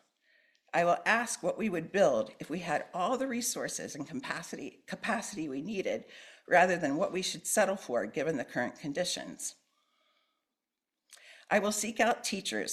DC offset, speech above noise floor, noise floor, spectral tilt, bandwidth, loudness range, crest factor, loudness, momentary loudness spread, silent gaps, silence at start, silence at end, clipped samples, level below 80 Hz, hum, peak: under 0.1%; 57 dB; -89 dBFS; -3 dB/octave; 14.5 kHz; 6 LU; 22 dB; -32 LUFS; 12 LU; none; 0.75 s; 0 s; under 0.1%; -74 dBFS; none; -10 dBFS